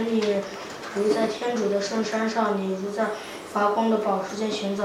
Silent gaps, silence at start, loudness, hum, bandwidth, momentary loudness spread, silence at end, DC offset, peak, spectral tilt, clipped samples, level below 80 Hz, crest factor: none; 0 s; -26 LUFS; none; 15 kHz; 7 LU; 0 s; under 0.1%; -10 dBFS; -5 dB/octave; under 0.1%; -66 dBFS; 16 dB